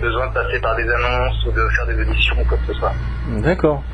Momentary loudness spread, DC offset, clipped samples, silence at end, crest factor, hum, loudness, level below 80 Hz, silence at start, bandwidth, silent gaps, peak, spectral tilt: 5 LU; under 0.1%; under 0.1%; 0 s; 14 dB; none; -19 LUFS; -22 dBFS; 0 s; 6.2 kHz; none; -4 dBFS; -7 dB/octave